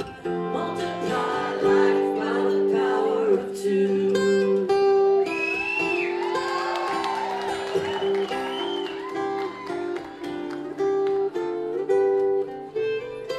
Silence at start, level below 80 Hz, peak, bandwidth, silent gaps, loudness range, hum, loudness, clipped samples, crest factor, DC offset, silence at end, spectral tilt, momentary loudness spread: 0 s; -62 dBFS; -10 dBFS; 12 kHz; none; 6 LU; none; -24 LUFS; under 0.1%; 14 dB; under 0.1%; 0 s; -5.5 dB/octave; 10 LU